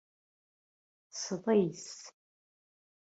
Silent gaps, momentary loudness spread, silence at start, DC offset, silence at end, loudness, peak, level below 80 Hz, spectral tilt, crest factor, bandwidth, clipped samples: none; 19 LU; 1.15 s; under 0.1%; 1.05 s; -32 LUFS; -16 dBFS; -82 dBFS; -5 dB/octave; 20 dB; 8 kHz; under 0.1%